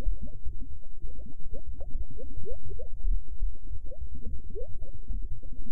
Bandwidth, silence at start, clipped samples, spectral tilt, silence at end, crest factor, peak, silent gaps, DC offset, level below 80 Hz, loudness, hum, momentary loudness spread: 0.8 kHz; 0 s; under 0.1%; -12 dB/octave; 0 s; 12 dB; -12 dBFS; none; 7%; -34 dBFS; -42 LUFS; none; 9 LU